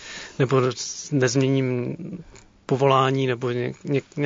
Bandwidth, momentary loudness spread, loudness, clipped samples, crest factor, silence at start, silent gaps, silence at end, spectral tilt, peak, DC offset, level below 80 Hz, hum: 7.6 kHz; 16 LU; -23 LUFS; under 0.1%; 20 dB; 0 s; none; 0 s; -5.5 dB/octave; -4 dBFS; under 0.1%; -60 dBFS; none